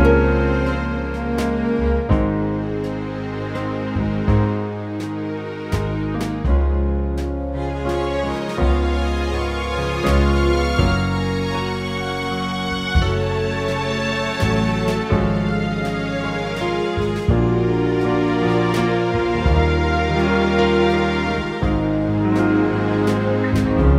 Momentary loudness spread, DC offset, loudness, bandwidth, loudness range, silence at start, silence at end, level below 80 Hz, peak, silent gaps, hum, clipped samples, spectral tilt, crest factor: 7 LU; under 0.1%; -20 LUFS; 13 kHz; 4 LU; 0 s; 0 s; -26 dBFS; -2 dBFS; none; none; under 0.1%; -7 dB/octave; 16 dB